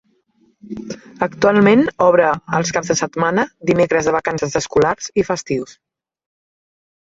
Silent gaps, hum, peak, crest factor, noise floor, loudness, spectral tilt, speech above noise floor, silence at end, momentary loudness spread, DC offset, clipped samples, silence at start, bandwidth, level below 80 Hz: none; none; -2 dBFS; 16 dB; -59 dBFS; -16 LUFS; -5 dB/octave; 42 dB; 1.45 s; 16 LU; under 0.1%; under 0.1%; 0.65 s; 7.8 kHz; -50 dBFS